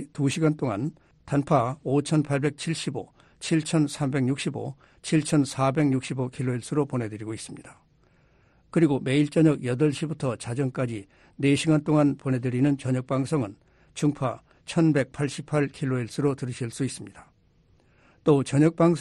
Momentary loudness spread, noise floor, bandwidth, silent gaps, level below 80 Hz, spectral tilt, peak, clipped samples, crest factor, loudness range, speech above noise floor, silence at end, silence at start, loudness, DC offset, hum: 13 LU; -62 dBFS; 11.5 kHz; none; -60 dBFS; -6.5 dB/octave; -8 dBFS; under 0.1%; 18 dB; 3 LU; 37 dB; 0 s; 0 s; -26 LUFS; under 0.1%; none